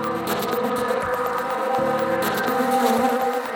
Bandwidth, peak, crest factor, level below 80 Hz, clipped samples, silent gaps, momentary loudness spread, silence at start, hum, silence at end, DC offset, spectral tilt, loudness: over 20 kHz; -8 dBFS; 14 dB; -56 dBFS; under 0.1%; none; 5 LU; 0 s; none; 0 s; under 0.1%; -4.5 dB/octave; -22 LUFS